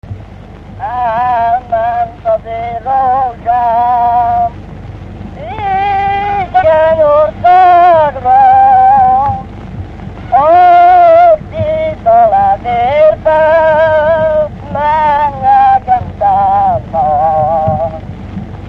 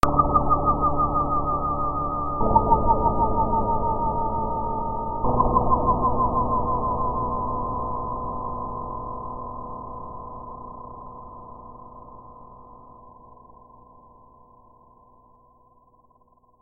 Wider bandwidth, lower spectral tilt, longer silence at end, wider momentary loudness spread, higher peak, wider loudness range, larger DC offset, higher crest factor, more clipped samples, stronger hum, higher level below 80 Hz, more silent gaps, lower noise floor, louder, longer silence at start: second, 5.8 kHz vs 8.2 kHz; second, -7.5 dB/octave vs -9.5 dB/octave; second, 0 s vs 2.8 s; about the same, 19 LU vs 21 LU; about the same, 0 dBFS vs 0 dBFS; second, 6 LU vs 20 LU; neither; second, 10 dB vs 24 dB; neither; neither; about the same, -32 dBFS vs -34 dBFS; neither; second, -30 dBFS vs -59 dBFS; first, -9 LUFS vs -24 LUFS; about the same, 0.05 s vs 0.05 s